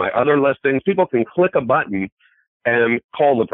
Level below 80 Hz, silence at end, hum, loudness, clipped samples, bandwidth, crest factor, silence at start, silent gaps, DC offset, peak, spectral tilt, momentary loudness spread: -58 dBFS; 0.05 s; none; -18 LUFS; under 0.1%; 4 kHz; 14 dB; 0 s; 2.12-2.17 s, 2.48-2.60 s, 3.04-3.09 s; under 0.1%; -4 dBFS; -11.5 dB/octave; 8 LU